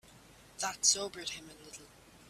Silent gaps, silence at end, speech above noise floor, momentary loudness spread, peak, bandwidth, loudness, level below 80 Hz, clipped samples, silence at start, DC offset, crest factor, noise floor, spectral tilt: none; 0 s; 22 dB; 23 LU; -12 dBFS; 15.5 kHz; -32 LUFS; -68 dBFS; under 0.1%; 0.05 s; under 0.1%; 26 dB; -58 dBFS; 0.5 dB/octave